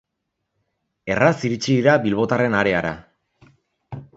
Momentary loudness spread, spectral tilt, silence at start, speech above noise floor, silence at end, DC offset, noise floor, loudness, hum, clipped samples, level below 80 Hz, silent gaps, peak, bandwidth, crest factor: 20 LU; -6 dB/octave; 1.05 s; 59 dB; 0.1 s; under 0.1%; -78 dBFS; -19 LUFS; none; under 0.1%; -52 dBFS; none; 0 dBFS; 8 kHz; 22 dB